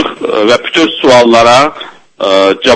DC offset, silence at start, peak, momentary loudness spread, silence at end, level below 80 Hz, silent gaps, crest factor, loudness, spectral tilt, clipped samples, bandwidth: under 0.1%; 0 s; 0 dBFS; 11 LU; 0 s; -44 dBFS; none; 8 dB; -7 LUFS; -3.5 dB/octave; 2%; 11 kHz